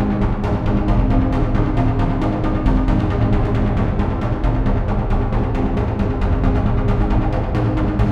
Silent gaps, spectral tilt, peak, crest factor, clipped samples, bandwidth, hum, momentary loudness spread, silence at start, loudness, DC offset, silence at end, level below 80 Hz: none; -9.5 dB/octave; -2 dBFS; 14 dB; under 0.1%; 6.4 kHz; none; 2 LU; 0 s; -19 LUFS; under 0.1%; 0 s; -20 dBFS